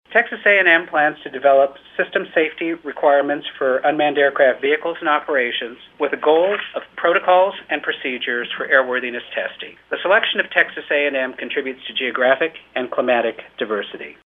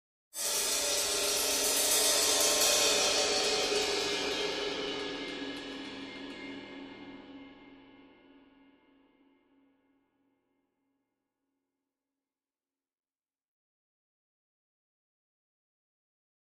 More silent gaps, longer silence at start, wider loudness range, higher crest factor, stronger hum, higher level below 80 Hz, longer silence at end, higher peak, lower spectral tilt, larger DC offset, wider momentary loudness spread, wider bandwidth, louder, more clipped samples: neither; second, 0.1 s vs 0.35 s; second, 3 LU vs 21 LU; about the same, 18 dB vs 22 dB; neither; about the same, -68 dBFS vs -66 dBFS; second, 0.25 s vs 8.55 s; first, 0 dBFS vs -14 dBFS; first, -6 dB/octave vs 0.5 dB/octave; neither; second, 10 LU vs 20 LU; second, 4 kHz vs 15.5 kHz; first, -18 LUFS vs -28 LUFS; neither